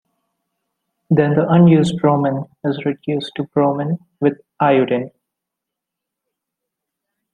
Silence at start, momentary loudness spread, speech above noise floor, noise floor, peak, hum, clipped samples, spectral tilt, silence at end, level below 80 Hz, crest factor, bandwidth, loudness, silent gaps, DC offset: 1.1 s; 11 LU; 67 dB; -82 dBFS; 0 dBFS; none; under 0.1%; -8 dB/octave; 2.25 s; -58 dBFS; 18 dB; 9.8 kHz; -17 LUFS; none; under 0.1%